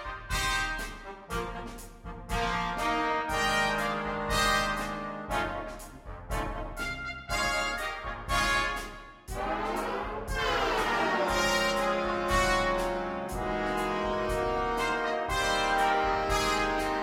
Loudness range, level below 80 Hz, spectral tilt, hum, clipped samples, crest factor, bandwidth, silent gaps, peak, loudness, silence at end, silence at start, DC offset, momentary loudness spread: 4 LU; -42 dBFS; -3.5 dB/octave; none; under 0.1%; 16 dB; 16 kHz; none; -14 dBFS; -29 LUFS; 0 s; 0 s; under 0.1%; 11 LU